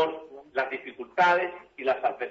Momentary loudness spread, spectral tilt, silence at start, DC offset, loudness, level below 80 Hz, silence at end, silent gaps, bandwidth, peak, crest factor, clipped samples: 12 LU; -4.5 dB/octave; 0 s; under 0.1%; -27 LUFS; -74 dBFS; 0 s; none; 7.8 kHz; -10 dBFS; 18 dB; under 0.1%